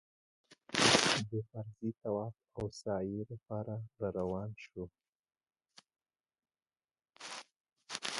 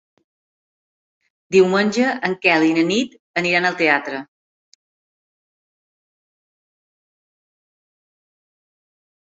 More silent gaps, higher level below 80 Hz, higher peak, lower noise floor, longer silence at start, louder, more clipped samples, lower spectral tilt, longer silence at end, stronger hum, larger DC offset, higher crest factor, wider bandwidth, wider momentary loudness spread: about the same, 5.09-5.23 s, 7.56-7.60 s vs 3.20-3.34 s; about the same, -66 dBFS vs -66 dBFS; second, -10 dBFS vs 0 dBFS; about the same, under -90 dBFS vs under -90 dBFS; second, 0.5 s vs 1.5 s; second, -35 LUFS vs -17 LUFS; neither; second, -3 dB/octave vs -4.5 dB/octave; second, 0 s vs 5.1 s; neither; neither; first, 30 dB vs 22 dB; first, 11.5 kHz vs 8 kHz; first, 19 LU vs 8 LU